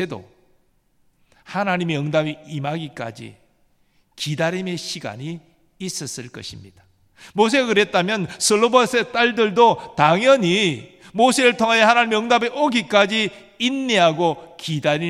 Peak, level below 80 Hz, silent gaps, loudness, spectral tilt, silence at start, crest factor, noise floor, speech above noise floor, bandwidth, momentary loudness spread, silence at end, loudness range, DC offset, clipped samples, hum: 0 dBFS; -64 dBFS; none; -18 LUFS; -4 dB/octave; 0 s; 20 dB; -62 dBFS; 42 dB; 15.5 kHz; 16 LU; 0 s; 12 LU; under 0.1%; under 0.1%; none